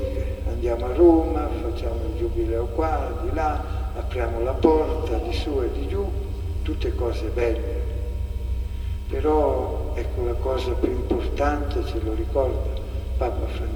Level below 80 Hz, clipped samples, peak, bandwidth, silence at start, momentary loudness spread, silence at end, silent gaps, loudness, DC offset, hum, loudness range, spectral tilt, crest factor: -28 dBFS; under 0.1%; -2 dBFS; 20 kHz; 0 s; 9 LU; 0 s; none; -25 LUFS; under 0.1%; none; 4 LU; -8 dB/octave; 22 dB